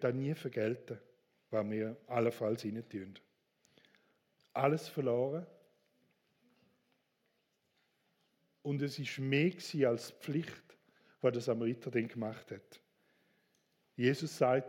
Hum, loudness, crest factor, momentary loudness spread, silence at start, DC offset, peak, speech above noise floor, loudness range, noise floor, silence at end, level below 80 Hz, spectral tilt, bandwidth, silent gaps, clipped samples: none; -36 LUFS; 22 dB; 15 LU; 0 s; under 0.1%; -16 dBFS; 44 dB; 6 LU; -80 dBFS; 0 s; -84 dBFS; -6.5 dB/octave; 17 kHz; none; under 0.1%